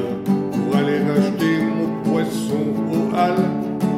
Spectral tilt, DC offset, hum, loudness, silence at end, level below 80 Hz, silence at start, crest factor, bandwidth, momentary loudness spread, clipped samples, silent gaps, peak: -7 dB/octave; under 0.1%; none; -20 LUFS; 0 s; -56 dBFS; 0 s; 14 dB; 15 kHz; 4 LU; under 0.1%; none; -6 dBFS